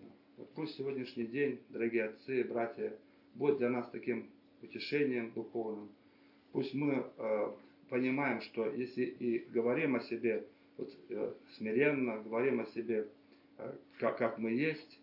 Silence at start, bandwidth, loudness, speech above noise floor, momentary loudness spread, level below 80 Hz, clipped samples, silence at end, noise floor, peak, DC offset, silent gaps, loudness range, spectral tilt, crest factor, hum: 0 s; 5.8 kHz; -37 LUFS; 28 dB; 15 LU; -86 dBFS; under 0.1%; 0.05 s; -64 dBFS; -16 dBFS; under 0.1%; none; 3 LU; -5 dB/octave; 20 dB; none